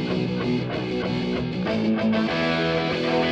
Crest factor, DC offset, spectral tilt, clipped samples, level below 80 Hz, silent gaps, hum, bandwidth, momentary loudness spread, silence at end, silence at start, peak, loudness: 12 dB; under 0.1%; -7 dB/octave; under 0.1%; -48 dBFS; none; none; 8.2 kHz; 4 LU; 0 s; 0 s; -10 dBFS; -24 LUFS